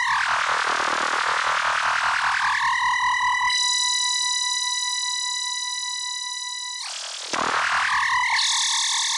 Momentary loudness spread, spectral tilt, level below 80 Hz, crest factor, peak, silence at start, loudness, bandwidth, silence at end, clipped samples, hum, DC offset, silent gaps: 8 LU; 2 dB/octave; -62 dBFS; 12 dB; -12 dBFS; 0 s; -21 LUFS; 12 kHz; 0 s; under 0.1%; none; under 0.1%; none